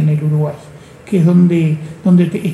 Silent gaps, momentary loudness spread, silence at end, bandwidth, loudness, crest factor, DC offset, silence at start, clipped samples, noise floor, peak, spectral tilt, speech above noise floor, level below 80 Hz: none; 9 LU; 0 s; 10.5 kHz; -13 LUFS; 12 dB; under 0.1%; 0 s; under 0.1%; -36 dBFS; -2 dBFS; -9 dB/octave; 25 dB; -54 dBFS